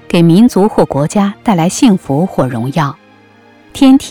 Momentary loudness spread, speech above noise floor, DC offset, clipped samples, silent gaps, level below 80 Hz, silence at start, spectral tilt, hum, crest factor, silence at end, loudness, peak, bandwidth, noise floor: 8 LU; 33 dB; under 0.1%; under 0.1%; none; -42 dBFS; 0.1 s; -6.5 dB/octave; none; 10 dB; 0 s; -11 LUFS; 0 dBFS; 16.5 kHz; -43 dBFS